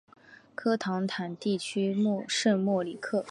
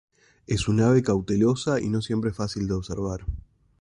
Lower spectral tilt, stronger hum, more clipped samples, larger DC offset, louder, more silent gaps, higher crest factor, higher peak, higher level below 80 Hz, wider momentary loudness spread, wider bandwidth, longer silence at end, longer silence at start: second, -5 dB/octave vs -6.5 dB/octave; neither; neither; neither; second, -29 LUFS vs -25 LUFS; neither; about the same, 16 dB vs 16 dB; about the same, -12 dBFS vs -10 dBFS; second, -78 dBFS vs -42 dBFS; second, 7 LU vs 11 LU; about the same, 11 kHz vs 11 kHz; second, 0 s vs 0.4 s; second, 0.3 s vs 0.5 s